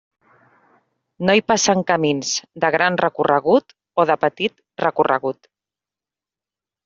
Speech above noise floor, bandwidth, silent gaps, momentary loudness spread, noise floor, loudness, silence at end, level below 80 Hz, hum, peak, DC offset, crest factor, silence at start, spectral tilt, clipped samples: 71 dB; 7.6 kHz; none; 8 LU; -89 dBFS; -19 LUFS; 1.55 s; -62 dBFS; none; -2 dBFS; under 0.1%; 18 dB; 1.2 s; -3 dB/octave; under 0.1%